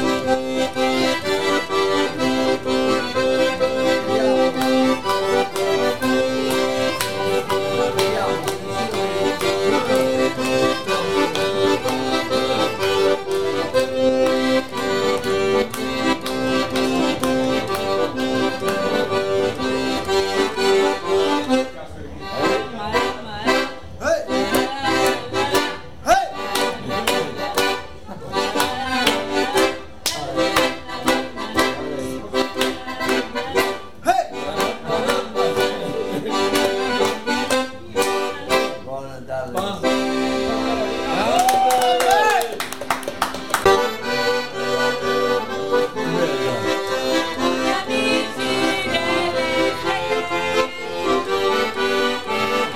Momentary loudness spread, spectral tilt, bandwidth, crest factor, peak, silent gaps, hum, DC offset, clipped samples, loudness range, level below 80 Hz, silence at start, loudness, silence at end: 6 LU; -3.5 dB/octave; 16.5 kHz; 20 dB; 0 dBFS; none; none; 1%; under 0.1%; 3 LU; -48 dBFS; 0 s; -20 LUFS; 0 s